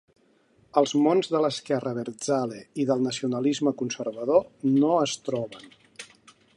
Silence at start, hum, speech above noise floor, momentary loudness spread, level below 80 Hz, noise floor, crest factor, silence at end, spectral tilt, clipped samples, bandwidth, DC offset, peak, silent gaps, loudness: 0.75 s; none; 38 dB; 14 LU; -70 dBFS; -62 dBFS; 20 dB; 0.5 s; -5.5 dB/octave; under 0.1%; 11.5 kHz; under 0.1%; -6 dBFS; none; -25 LUFS